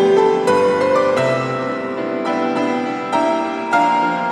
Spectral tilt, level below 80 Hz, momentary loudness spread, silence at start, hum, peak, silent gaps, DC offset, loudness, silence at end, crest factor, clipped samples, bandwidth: -5.5 dB/octave; -68 dBFS; 7 LU; 0 s; none; -2 dBFS; none; under 0.1%; -17 LUFS; 0 s; 14 dB; under 0.1%; 11.5 kHz